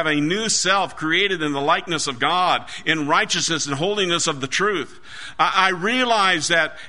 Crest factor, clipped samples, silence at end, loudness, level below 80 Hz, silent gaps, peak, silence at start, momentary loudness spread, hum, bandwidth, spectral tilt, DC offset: 18 dB; under 0.1%; 0 s; -19 LUFS; -56 dBFS; none; -2 dBFS; 0 s; 5 LU; none; 11 kHz; -2.5 dB/octave; 1%